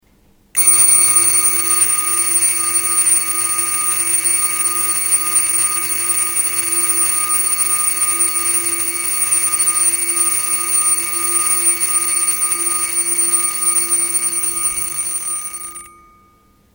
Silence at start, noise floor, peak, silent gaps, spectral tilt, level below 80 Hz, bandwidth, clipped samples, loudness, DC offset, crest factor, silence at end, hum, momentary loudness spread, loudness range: 0.55 s; -53 dBFS; -2 dBFS; none; 1 dB/octave; -56 dBFS; over 20 kHz; under 0.1%; -13 LUFS; under 0.1%; 16 dB; 0.85 s; none; 5 LU; 3 LU